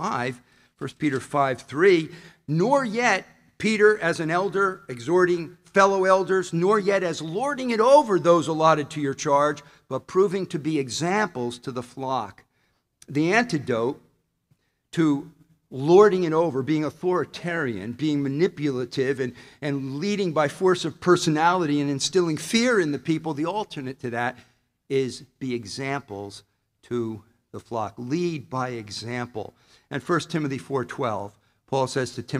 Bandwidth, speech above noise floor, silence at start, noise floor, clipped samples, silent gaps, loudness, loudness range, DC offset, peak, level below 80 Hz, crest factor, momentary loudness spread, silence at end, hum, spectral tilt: 13 kHz; 46 dB; 0 s; -70 dBFS; under 0.1%; none; -24 LUFS; 10 LU; under 0.1%; -4 dBFS; -64 dBFS; 20 dB; 14 LU; 0 s; none; -5.5 dB/octave